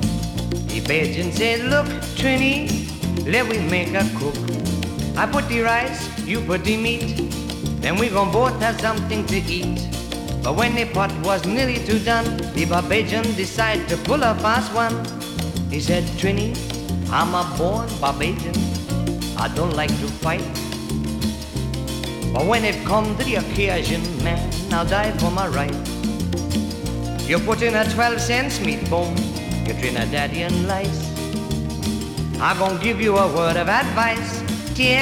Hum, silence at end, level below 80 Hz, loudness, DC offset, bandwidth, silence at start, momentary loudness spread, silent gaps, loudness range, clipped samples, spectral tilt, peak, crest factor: none; 0 s; -34 dBFS; -21 LUFS; under 0.1%; 18 kHz; 0 s; 7 LU; none; 3 LU; under 0.1%; -5 dB/octave; -4 dBFS; 16 dB